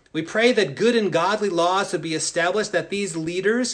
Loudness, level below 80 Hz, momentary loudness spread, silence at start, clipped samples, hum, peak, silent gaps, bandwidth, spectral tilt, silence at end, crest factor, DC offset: -21 LUFS; -62 dBFS; 7 LU; 0.15 s; under 0.1%; none; -6 dBFS; none; 10 kHz; -3.5 dB/octave; 0 s; 16 dB; under 0.1%